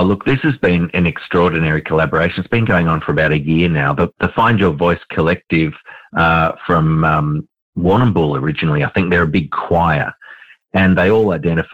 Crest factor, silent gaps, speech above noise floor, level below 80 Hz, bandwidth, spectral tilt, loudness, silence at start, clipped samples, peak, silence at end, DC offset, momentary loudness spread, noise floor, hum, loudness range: 10 dB; 7.62-7.73 s; 26 dB; -36 dBFS; 5 kHz; -9 dB/octave; -15 LUFS; 0 s; under 0.1%; -4 dBFS; 0.1 s; under 0.1%; 4 LU; -41 dBFS; none; 1 LU